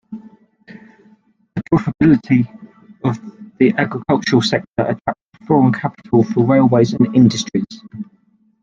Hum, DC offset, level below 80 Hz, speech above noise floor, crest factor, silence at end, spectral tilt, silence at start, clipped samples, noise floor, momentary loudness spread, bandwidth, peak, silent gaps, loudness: none; under 0.1%; -50 dBFS; 43 dB; 16 dB; 0.6 s; -6.5 dB/octave; 0.1 s; under 0.1%; -57 dBFS; 20 LU; 7.6 kHz; 0 dBFS; 5.21-5.32 s; -16 LUFS